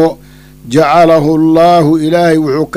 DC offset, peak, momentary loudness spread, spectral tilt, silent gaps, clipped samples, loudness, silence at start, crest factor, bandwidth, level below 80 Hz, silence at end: under 0.1%; 0 dBFS; 5 LU; -7 dB/octave; none; under 0.1%; -8 LUFS; 0 s; 8 dB; 15.5 kHz; -40 dBFS; 0 s